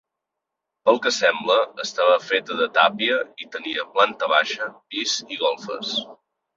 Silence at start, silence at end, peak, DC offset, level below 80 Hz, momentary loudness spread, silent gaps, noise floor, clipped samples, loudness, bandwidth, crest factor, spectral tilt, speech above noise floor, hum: 0.85 s; 0.4 s; 0 dBFS; under 0.1%; -72 dBFS; 10 LU; none; -83 dBFS; under 0.1%; -21 LUFS; 7.8 kHz; 22 dB; -1.5 dB/octave; 62 dB; none